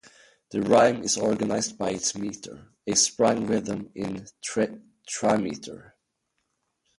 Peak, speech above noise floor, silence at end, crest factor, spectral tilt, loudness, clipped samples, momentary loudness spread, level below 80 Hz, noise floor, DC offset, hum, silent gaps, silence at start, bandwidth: -6 dBFS; 52 dB; 1.15 s; 20 dB; -3.5 dB/octave; -25 LUFS; under 0.1%; 18 LU; -62 dBFS; -78 dBFS; under 0.1%; none; none; 0.5 s; 11.5 kHz